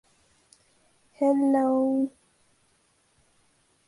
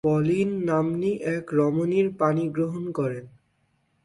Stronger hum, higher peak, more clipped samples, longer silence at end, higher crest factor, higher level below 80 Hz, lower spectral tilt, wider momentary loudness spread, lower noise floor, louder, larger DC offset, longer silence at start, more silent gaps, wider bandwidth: neither; second, -12 dBFS vs -8 dBFS; neither; first, 1.8 s vs 0.75 s; about the same, 16 dB vs 16 dB; second, -74 dBFS vs -62 dBFS; second, -7 dB/octave vs -8.5 dB/octave; about the same, 6 LU vs 6 LU; about the same, -67 dBFS vs -69 dBFS; about the same, -24 LUFS vs -25 LUFS; neither; first, 1.2 s vs 0.05 s; neither; about the same, 11.5 kHz vs 11.5 kHz